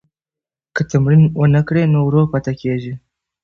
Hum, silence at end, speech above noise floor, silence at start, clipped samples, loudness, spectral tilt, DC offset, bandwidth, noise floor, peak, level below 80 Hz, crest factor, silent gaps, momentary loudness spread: none; 0.45 s; 75 dB; 0.75 s; under 0.1%; -15 LUFS; -9 dB/octave; under 0.1%; 6.8 kHz; -89 dBFS; -4 dBFS; -44 dBFS; 12 dB; none; 13 LU